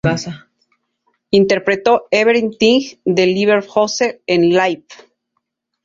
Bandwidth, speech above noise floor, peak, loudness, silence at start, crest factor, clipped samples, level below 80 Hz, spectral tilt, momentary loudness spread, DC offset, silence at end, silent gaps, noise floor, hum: 7.6 kHz; 58 dB; 0 dBFS; -15 LUFS; 0.05 s; 16 dB; under 0.1%; -52 dBFS; -5 dB/octave; 6 LU; under 0.1%; 0.9 s; none; -72 dBFS; none